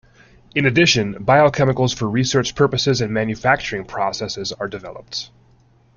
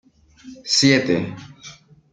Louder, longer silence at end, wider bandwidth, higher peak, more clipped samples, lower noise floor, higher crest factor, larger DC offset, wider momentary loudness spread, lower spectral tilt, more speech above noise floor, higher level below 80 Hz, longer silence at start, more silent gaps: about the same, -18 LUFS vs -17 LUFS; first, 0.7 s vs 0.4 s; second, 7.4 kHz vs 9.4 kHz; about the same, -2 dBFS vs -2 dBFS; neither; first, -54 dBFS vs -44 dBFS; about the same, 18 dB vs 20 dB; neither; second, 14 LU vs 24 LU; about the same, -4.5 dB/octave vs -3.5 dB/octave; first, 35 dB vs 25 dB; first, -48 dBFS vs -60 dBFS; about the same, 0.55 s vs 0.45 s; neither